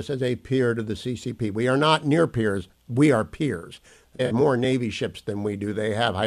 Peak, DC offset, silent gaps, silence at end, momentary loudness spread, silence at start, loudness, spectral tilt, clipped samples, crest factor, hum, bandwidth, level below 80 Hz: -6 dBFS; under 0.1%; none; 0 s; 10 LU; 0 s; -24 LUFS; -6.5 dB/octave; under 0.1%; 16 dB; none; 13.5 kHz; -54 dBFS